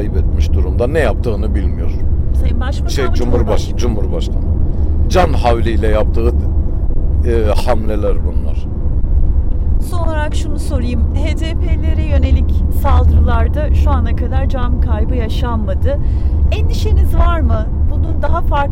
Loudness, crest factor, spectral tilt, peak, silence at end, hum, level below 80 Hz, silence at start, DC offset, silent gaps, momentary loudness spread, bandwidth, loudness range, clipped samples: -16 LUFS; 10 dB; -7.5 dB/octave; -2 dBFS; 0 s; none; -14 dBFS; 0 s; under 0.1%; none; 5 LU; 11.5 kHz; 3 LU; under 0.1%